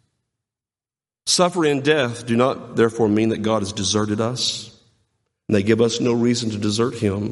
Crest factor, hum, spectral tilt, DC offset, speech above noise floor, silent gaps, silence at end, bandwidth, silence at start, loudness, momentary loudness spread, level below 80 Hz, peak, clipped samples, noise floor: 18 dB; none; -4.5 dB/octave; under 0.1%; over 71 dB; none; 0 s; 11.5 kHz; 1.25 s; -20 LUFS; 5 LU; -58 dBFS; -2 dBFS; under 0.1%; under -90 dBFS